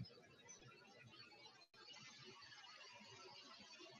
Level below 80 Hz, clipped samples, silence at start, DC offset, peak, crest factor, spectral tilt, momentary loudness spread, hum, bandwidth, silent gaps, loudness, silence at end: under -90 dBFS; under 0.1%; 0 s; under 0.1%; -42 dBFS; 20 dB; -2.5 dB/octave; 5 LU; none; 10.5 kHz; none; -60 LUFS; 0 s